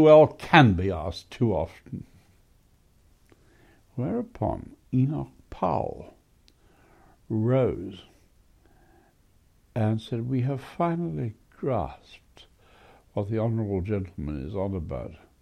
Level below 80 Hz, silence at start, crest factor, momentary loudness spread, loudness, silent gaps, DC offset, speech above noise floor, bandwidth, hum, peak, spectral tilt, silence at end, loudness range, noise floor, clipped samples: -50 dBFS; 0 s; 24 dB; 19 LU; -26 LUFS; none; under 0.1%; 36 dB; 11 kHz; none; -2 dBFS; -8 dB/octave; 0.25 s; 4 LU; -61 dBFS; under 0.1%